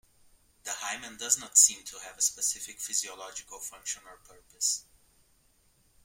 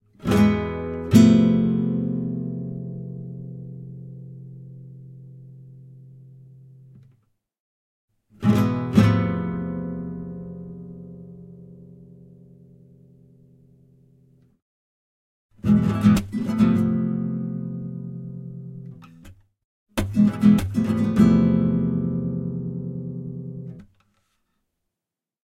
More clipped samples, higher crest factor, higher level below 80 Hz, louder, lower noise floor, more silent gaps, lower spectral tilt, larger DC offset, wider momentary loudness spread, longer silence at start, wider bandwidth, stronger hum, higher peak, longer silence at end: neither; about the same, 26 dB vs 22 dB; second, -68 dBFS vs -48 dBFS; second, -27 LUFS vs -21 LUFS; second, -67 dBFS vs -88 dBFS; second, none vs 7.60-8.08 s, 14.62-15.49 s, 19.65-19.86 s; second, 2.5 dB/octave vs -8 dB/octave; neither; about the same, 21 LU vs 23 LU; first, 0.65 s vs 0.2 s; first, 16.5 kHz vs 13.5 kHz; neither; second, -6 dBFS vs -2 dBFS; second, 1.25 s vs 1.65 s